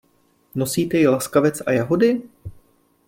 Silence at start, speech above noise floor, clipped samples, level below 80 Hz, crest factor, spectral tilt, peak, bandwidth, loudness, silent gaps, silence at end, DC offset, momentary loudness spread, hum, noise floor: 0.55 s; 42 dB; under 0.1%; -54 dBFS; 18 dB; -5.5 dB/octave; -4 dBFS; 16.5 kHz; -19 LUFS; none; 0.6 s; under 0.1%; 10 LU; none; -61 dBFS